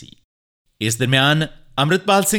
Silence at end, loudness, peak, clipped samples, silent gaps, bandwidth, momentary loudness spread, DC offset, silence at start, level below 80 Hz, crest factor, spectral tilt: 0 s; -18 LUFS; -2 dBFS; under 0.1%; 0.24-0.65 s; 19 kHz; 9 LU; under 0.1%; 0 s; -50 dBFS; 18 dB; -4 dB/octave